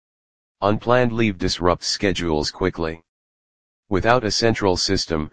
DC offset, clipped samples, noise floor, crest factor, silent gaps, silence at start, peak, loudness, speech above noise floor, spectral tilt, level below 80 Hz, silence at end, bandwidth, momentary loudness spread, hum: 2%; under 0.1%; under -90 dBFS; 20 dB; 3.09-3.83 s; 0.55 s; 0 dBFS; -20 LUFS; over 70 dB; -4.5 dB/octave; -40 dBFS; 0 s; 10 kHz; 6 LU; none